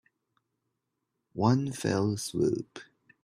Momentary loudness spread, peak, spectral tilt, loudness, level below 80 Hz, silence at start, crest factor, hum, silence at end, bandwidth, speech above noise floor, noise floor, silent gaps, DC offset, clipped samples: 18 LU; -10 dBFS; -6 dB/octave; -29 LUFS; -64 dBFS; 1.35 s; 20 dB; none; 0.4 s; 15 kHz; 54 dB; -83 dBFS; none; under 0.1%; under 0.1%